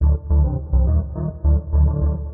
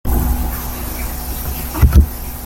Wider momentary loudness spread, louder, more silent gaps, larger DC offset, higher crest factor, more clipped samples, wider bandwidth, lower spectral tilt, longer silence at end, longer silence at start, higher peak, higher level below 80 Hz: second, 4 LU vs 11 LU; about the same, -20 LUFS vs -18 LUFS; neither; neither; second, 10 dB vs 16 dB; neither; second, 1.5 kHz vs 17 kHz; first, -17 dB/octave vs -6 dB/octave; about the same, 0 s vs 0 s; about the same, 0 s vs 0.05 s; second, -6 dBFS vs 0 dBFS; about the same, -20 dBFS vs -18 dBFS